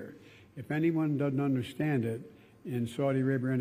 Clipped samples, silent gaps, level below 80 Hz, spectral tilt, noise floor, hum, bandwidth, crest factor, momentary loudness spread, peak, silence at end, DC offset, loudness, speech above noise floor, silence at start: under 0.1%; none; -72 dBFS; -8 dB/octave; -53 dBFS; none; 15 kHz; 14 dB; 19 LU; -18 dBFS; 0 s; under 0.1%; -31 LUFS; 22 dB; 0 s